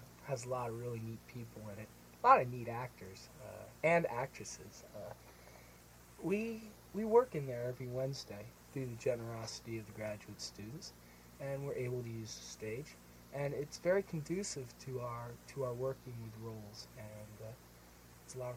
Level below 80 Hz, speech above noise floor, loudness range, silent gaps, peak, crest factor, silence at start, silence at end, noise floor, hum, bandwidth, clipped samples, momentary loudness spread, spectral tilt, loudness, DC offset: -66 dBFS; 20 dB; 9 LU; none; -14 dBFS; 26 dB; 0 s; 0 s; -60 dBFS; none; 16.5 kHz; under 0.1%; 20 LU; -5.5 dB/octave; -39 LUFS; under 0.1%